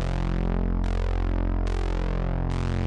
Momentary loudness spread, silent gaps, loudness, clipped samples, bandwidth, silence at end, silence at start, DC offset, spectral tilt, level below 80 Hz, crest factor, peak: 1 LU; none; -28 LUFS; under 0.1%; 7.6 kHz; 0 s; 0 s; under 0.1%; -7.5 dB/octave; -26 dBFS; 12 dB; -14 dBFS